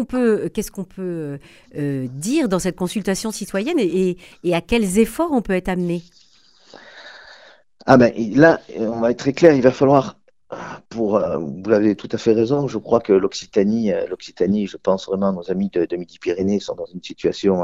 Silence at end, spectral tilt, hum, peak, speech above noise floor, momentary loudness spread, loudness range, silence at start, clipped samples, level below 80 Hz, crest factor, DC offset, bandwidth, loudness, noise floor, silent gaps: 0 s; -6 dB/octave; none; 0 dBFS; 29 dB; 16 LU; 6 LU; 0 s; under 0.1%; -46 dBFS; 20 dB; 0.1%; 16 kHz; -19 LUFS; -48 dBFS; none